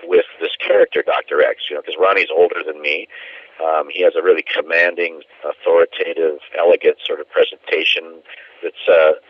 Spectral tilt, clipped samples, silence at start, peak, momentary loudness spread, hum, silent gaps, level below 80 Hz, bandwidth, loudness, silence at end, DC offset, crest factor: -3.5 dB/octave; under 0.1%; 0 s; -2 dBFS; 10 LU; none; none; -68 dBFS; 6.2 kHz; -16 LUFS; 0.1 s; under 0.1%; 16 dB